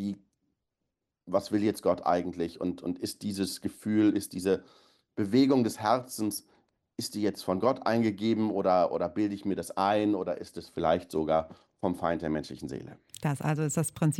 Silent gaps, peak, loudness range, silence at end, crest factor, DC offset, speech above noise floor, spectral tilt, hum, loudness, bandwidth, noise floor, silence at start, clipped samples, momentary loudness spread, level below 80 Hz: none; -12 dBFS; 3 LU; 0 s; 18 dB; under 0.1%; 56 dB; -6 dB/octave; none; -30 LUFS; 16 kHz; -85 dBFS; 0 s; under 0.1%; 12 LU; -62 dBFS